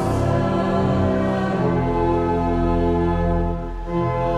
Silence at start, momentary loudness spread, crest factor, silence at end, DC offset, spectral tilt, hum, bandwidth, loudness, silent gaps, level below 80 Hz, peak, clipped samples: 0 s; 4 LU; 12 dB; 0 s; under 0.1%; -8.5 dB/octave; none; 11.5 kHz; -21 LUFS; none; -30 dBFS; -8 dBFS; under 0.1%